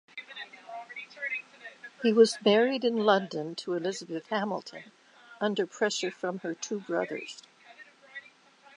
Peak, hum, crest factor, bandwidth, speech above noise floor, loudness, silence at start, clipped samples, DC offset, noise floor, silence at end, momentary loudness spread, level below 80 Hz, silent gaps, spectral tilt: -8 dBFS; none; 22 dB; 11 kHz; 29 dB; -29 LUFS; 0.15 s; under 0.1%; under 0.1%; -57 dBFS; 0.55 s; 22 LU; -86 dBFS; none; -4 dB/octave